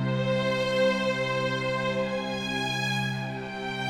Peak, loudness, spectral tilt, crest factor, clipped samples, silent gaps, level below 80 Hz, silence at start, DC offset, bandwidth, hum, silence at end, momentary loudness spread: -14 dBFS; -27 LUFS; -5 dB/octave; 14 dB; under 0.1%; none; -56 dBFS; 0 s; under 0.1%; 15 kHz; none; 0 s; 7 LU